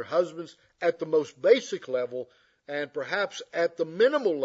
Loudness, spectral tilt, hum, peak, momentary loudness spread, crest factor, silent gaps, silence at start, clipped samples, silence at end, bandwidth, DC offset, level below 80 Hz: -27 LUFS; -4.5 dB/octave; none; -6 dBFS; 14 LU; 20 dB; none; 0 s; under 0.1%; 0 s; 8 kHz; under 0.1%; -82 dBFS